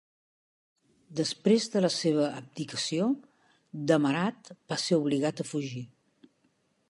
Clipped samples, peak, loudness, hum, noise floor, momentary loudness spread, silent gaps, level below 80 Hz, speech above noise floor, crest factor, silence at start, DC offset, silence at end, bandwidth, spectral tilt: under 0.1%; -10 dBFS; -29 LUFS; none; -71 dBFS; 13 LU; none; -78 dBFS; 43 dB; 20 dB; 1.1 s; under 0.1%; 1.05 s; 11.5 kHz; -5 dB/octave